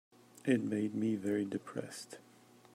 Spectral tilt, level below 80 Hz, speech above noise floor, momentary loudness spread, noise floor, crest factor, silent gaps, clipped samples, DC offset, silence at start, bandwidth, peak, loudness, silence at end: -6 dB/octave; -80 dBFS; 26 dB; 15 LU; -62 dBFS; 20 dB; none; under 0.1%; under 0.1%; 0.45 s; 15.5 kHz; -18 dBFS; -36 LUFS; 0.55 s